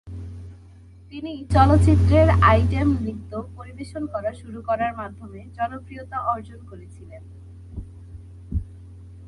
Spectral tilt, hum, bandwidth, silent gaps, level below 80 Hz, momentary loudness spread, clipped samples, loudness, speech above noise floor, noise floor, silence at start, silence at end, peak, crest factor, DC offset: -8 dB/octave; none; 11 kHz; none; -30 dBFS; 26 LU; under 0.1%; -21 LUFS; 25 dB; -46 dBFS; 0.05 s; 0 s; -2 dBFS; 20 dB; under 0.1%